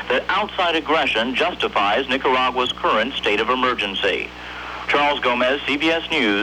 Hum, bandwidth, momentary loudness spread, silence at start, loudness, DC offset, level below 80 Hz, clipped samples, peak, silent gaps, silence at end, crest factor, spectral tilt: none; 15 kHz; 3 LU; 0 s; -19 LUFS; under 0.1%; -46 dBFS; under 0.1%; -6 dBFS; none; 0 s; 14 dB; -3.5 dB/octave